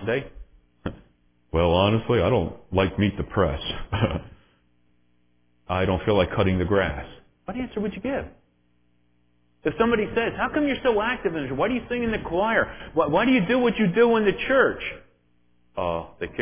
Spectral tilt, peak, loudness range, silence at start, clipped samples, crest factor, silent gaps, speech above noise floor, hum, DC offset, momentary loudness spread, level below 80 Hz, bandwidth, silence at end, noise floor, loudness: -10.5 dB/octave; -6 dBFS; 6 LU; 0 s; under 0.1%; 18 dB; none; 44 dB; 60 Hz at -50 dBFS; under 0.1%; 14 LU; -40 dBFS; 3.6 kHz; 0 s; -67 dBFS; -24 LUFS